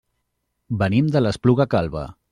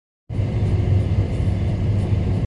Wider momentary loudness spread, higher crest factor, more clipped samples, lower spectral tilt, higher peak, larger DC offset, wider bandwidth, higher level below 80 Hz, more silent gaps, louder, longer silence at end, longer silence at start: first, 11 LU vs 5 LU; about the same, 16 dB vs 12 dB; neither; about the same, -8 dB/octave vs -9 dB/octave; first, -4 dBFS vs -8 dBFS; neither; first, 10.5 kHz vs 7.2 kHz; second, -46 dBFS vs -26 dBFS; neither; about the same, -20 LUFS vs -21 LUFS; first, 0.2 s vs 0 s; first, 0.7 s vs 0.3 s